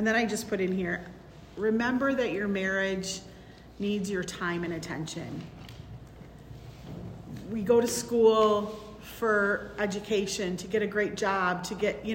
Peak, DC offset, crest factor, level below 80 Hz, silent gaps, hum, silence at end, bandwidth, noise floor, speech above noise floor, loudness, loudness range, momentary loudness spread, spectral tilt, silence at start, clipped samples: -12 dBFS; under 0.1%; 18 dB; -56 dBFS; none; none; 0 s; 16 kHz; -49 dBFS; 21 dB; -29 LUFS; 8 LU; 21 LU; -4.5 dB/octave; 0 s; under 0.1%